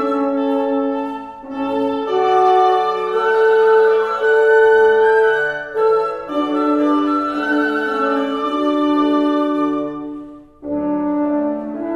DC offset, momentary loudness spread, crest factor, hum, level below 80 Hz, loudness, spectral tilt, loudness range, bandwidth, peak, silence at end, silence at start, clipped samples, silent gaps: under 0.1%; 11 LU; 14 dB; none; -54 dBFS; -16 LUFS; -5.5 dB/octave; 5 LU; 8 kHz; -2 dBFS; 0 s; 0 s; under 0.1%; none